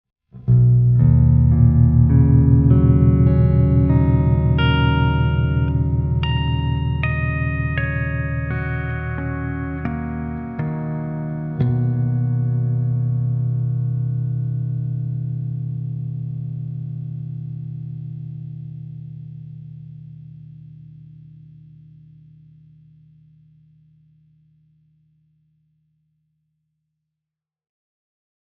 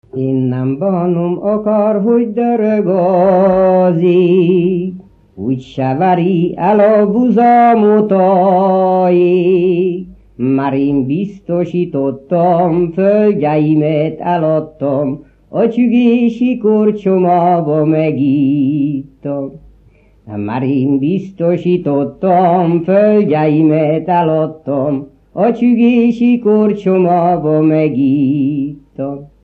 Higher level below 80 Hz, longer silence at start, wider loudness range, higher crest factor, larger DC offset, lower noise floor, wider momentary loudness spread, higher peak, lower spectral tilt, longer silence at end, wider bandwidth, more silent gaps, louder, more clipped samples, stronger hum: first, -32 dBFS vs -50 dBFS; first, 0.35 s vs 0.15 s; first, 19 LU vs 5 LU; about the same, 16 dB vs 12 dB; neither; first, -87 dBFS vs -47 dBFS; first, 19 LU vs 9 LU; about the same, -2 dBFS vs 0 dBFS; second, -8 dB/octave vs -10.5 dB/octave; first, 8.3 s vs 0.15 s; second, 3.9 kHz vs 4.7 kHz; neither; second, -19 LUFS vs -12 LUFS; neither; first, 60 Hz at -60 dBFS vs none